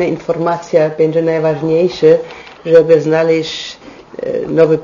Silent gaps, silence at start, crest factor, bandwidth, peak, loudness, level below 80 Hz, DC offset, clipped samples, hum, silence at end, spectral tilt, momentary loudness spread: none; 0 s; 12 dB; 7.4 kHz; 0 dBFS; -13 LUFS; -52 dBFS; under 0.1%; 0.2%; none; 0 s; -6.5 dB/octave; 14 LU